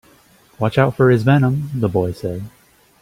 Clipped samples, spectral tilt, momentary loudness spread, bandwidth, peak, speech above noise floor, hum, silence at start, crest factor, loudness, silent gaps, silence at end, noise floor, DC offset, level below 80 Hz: under 0.1%; -8.5 dB/octave; 13 LU; 15 kHz; -2 dBFS; 35 dB; none; 0.6 s; 16 dB; -17 LUFS; none; 0.55 s; -51 dBFS; under 0.1%; -50 dBFS